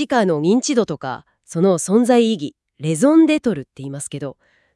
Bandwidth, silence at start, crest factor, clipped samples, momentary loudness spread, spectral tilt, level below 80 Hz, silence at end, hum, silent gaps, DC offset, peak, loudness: 12 kHz; 0 s; 16 dB; under 0.1%; 16 LU; -5.5 dB/octave; -62 dBFS; 0.45 s; none; none; under 0.1%; -2 dBFS; -17 LUFS